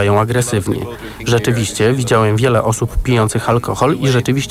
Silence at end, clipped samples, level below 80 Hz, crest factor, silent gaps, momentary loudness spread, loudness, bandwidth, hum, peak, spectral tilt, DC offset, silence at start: 0 s; under 0.1%; -30 dBFS; 12 dB; none; 5 LU; -15 LUFS; 15.5 kHz; none; -2 dBFS; -5.5 dB/octave; under 0.1%; 0 s